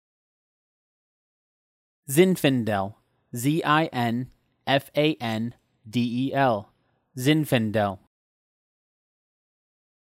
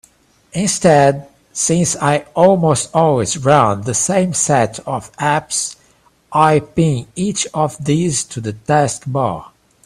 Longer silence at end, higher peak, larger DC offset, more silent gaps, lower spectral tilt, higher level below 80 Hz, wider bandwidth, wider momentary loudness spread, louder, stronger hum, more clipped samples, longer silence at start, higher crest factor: first, 2.15 s vs 0.4 s; second, -6 dBFS vs 0 dBFS; neither; neither; about the same, -5.5 dB/octave vs -4.5 dB/octave; second, -68 dBFS vs -48 dBFS; first, 16 kHz vs 14.5 kHz; first, 14 LU vs 10 LU; second, -24 LUFS vs -15 LUFS; neither; neither; first, 2.1 s vs 0.55 s; about the same, 20 dB vs 16 dB